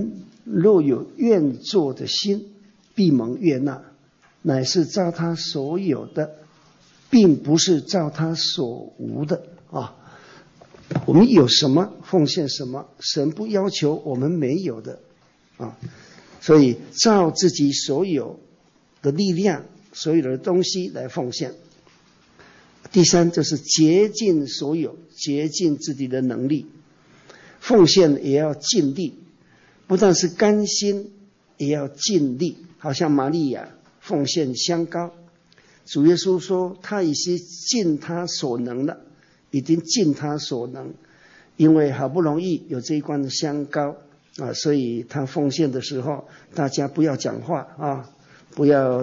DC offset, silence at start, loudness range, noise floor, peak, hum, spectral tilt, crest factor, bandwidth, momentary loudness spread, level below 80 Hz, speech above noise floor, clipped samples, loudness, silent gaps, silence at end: under 0.1%; 0 s; 6 LU; -58 dBFS; -6 dBFS; none; -5 dB/octave; 16 dB; 8 kHz; 14 LU; -62 dBFS; 38 dB; under 0.1%; -21 LUFS; none; 0 s